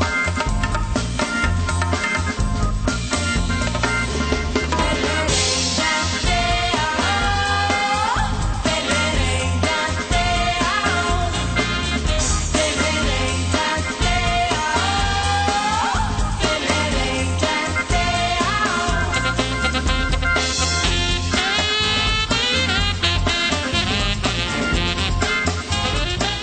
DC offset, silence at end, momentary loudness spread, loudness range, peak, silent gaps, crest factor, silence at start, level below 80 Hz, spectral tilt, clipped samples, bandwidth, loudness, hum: under 0.1%; 0 s; 4 LU; 3 LU; -4 dBFS; none; 16 dB; 0 s; -26 dBFS; -3.5 dB/octave; under 0.1%; 9.2 kHz; -19 LUFS; none